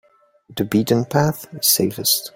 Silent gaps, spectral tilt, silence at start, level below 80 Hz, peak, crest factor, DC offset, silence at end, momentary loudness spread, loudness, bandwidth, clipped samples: none; -4 dB/octave; 0.5 s; -54 dBFS; -2 dBFS; 18 dB; under 0.1%; 0.05 s; 8 LU; -18 LUFS; 17 kHz; under 0.1%